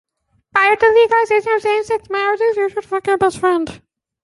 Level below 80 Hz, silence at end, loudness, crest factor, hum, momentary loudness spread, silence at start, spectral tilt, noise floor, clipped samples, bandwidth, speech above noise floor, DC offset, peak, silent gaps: -54 dBFS; 0.45 s; -16 LUFS; 16 dB; none; 9 LU; 0.55 s; -4 dB/octave; -57 dBFS; under 0.1%; 11.5 kHz; 42 dB; under 0.1%; -2 dBFS; none